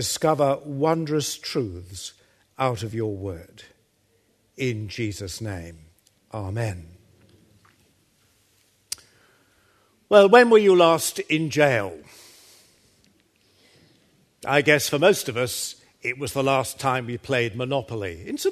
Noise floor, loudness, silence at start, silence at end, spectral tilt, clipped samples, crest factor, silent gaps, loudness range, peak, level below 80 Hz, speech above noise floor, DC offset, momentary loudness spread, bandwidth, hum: -65 dBFS; -22 LUFS; 0 s; 0 s; -4.5 dB/octave; under 0.1%; 24 dB; none; 17 LU; 0 dBFS; -58 dBFS; 43 dB; under 0.1%; 19 LU; 13.5 kHz; none